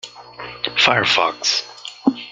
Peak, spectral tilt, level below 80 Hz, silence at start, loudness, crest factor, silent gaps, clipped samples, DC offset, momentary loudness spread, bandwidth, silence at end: 0 dBFS; -2.5 dB/octave; -58 dBFS; 0.05 s; -17 LUFS; 20 dB; none; under 0.1%; under 0.1%; 20 LU; 9.4 kHz; 0 s